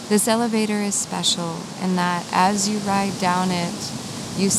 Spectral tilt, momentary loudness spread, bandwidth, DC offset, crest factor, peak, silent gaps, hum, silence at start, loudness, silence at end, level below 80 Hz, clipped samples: -3.5 dB/octave; 10 LU; 15 kHz; under 0.1%; 18 dB; -2 dBFS; none; none; 0 s; -21 LUFS; 0 s; -58 dBFS; under 0.1%